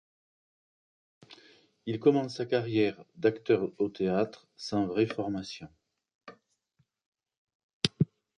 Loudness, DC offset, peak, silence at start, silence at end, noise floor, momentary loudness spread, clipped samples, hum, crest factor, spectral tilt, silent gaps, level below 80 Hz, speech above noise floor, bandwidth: -30 LUFS; under 0.1%; -4 dBFS; 1.3 s; 0.3 s; -75 dBFS; 11 LU; under 0.1%; none; 30 dB; -6 dB/octave; 6.15-6.21 s, 7.06-7.12 s, 7.37-7.47 s, 7.55-7.81 s; -66 dBFS; 45 dB; 10.5 kHz